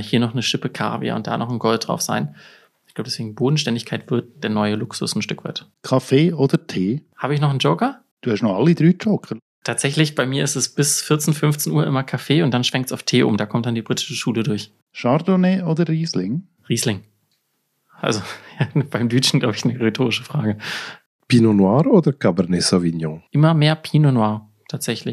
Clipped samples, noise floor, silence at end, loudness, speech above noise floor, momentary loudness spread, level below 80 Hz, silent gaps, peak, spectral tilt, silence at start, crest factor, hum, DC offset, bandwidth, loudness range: under 0.1%; -70 dBFS; 0 s; -19 LUFS; 51 dB; 11 LU; -62 dBFS; 8.11-8.17 s, 9.42-9.62 s, 14.82-14.87 s, 21.06-21.19 s; -2 dBFS; -5 dB/octave; 0 s; 18 dB; none; under 0.1%; 13.5 kHz; 5 LU